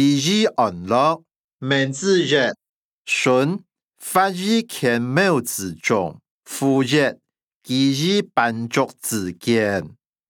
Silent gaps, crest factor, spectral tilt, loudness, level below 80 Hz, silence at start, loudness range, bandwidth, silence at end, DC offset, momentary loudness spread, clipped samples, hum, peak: 1.36-1.59 s, 2.69-3.05 s, 3.84-3.88 s, 6.31-6.41 s, 7.56-7.61 s; 18 dB; -4.5 dB/octave; -20 LUFS; -66 dBFS; 0 s; 1 LU; 19.5 kHz; 0.4 s; under 0.1%; 10 LU; under 0.1%; none; -2 dBFS